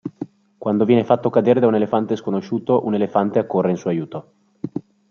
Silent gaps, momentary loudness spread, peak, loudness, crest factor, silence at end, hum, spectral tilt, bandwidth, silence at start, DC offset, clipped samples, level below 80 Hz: none; 17 LU; -2 dBFS; -19 LUFS; 18 dB; 0.3 s; none; -8.5 dB/octave; 6.8 kHz; 0.05 s; under 0.1%; under 0.1%; -64 dBFS